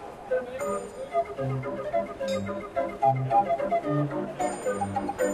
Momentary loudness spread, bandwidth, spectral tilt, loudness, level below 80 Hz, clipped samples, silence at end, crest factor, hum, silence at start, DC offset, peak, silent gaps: 7 LU; 14.5 kHz; -6.5 dB/octave; -29 LUFS; -56 dBFS; under 0.1%; 0 s; 16 dB; none; 0 s; under 0.1%; -12 dBFS; none